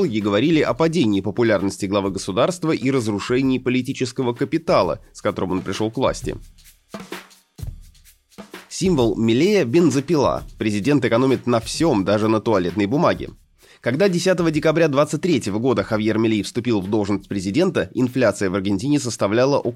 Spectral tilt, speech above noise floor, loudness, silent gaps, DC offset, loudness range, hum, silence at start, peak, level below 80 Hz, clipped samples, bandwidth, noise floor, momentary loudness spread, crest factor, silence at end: -6 dB/octave; 32 dB; -20 LUFS; none; under 0.1%; 6 LU; none; 0 s; -4 dBFS; -46 dBFS; under 0.1%; 15 kHz; -51 dBFS; 10 LU; 16 dB; 0 s